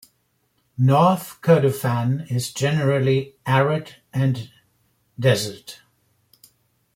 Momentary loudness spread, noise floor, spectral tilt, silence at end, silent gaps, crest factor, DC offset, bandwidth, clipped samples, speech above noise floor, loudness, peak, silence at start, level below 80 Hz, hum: 13 LU; -68 dBFS; -6.5 dB/octave; 1.2 s; none; 18 dB; under 0.1%; 16.5 kHz; under 0.1%; 48 dB; -21 LUFS; -4 dBFS; 0.8 s; -58 dBFS; none